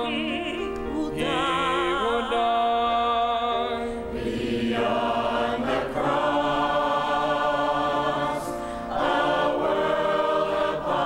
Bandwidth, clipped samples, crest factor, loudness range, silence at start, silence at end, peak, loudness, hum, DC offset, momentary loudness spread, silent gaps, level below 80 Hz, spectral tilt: 16 kHz; under 0.1%; 14 dB; 1 LU; 0 s; 0 s; -10 dBFS; -25 LUFS; none; under 0.1%; 7 LU; none; -46 dBFS; -5 dB/octave